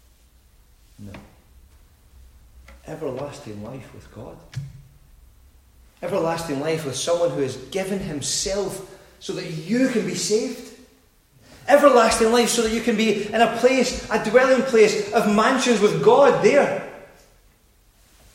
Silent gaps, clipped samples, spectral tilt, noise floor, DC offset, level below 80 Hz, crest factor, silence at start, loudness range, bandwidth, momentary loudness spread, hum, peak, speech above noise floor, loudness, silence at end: none; under 0.1%; -4 dB/octave; -57 dBFS; under 0.1%; -50 dBFS; 20 dB; 1 s; 19 LU; 16 kHz; 21 LU; none; -2 dBFS; 37 dB; -20 LUFS; 1.3 s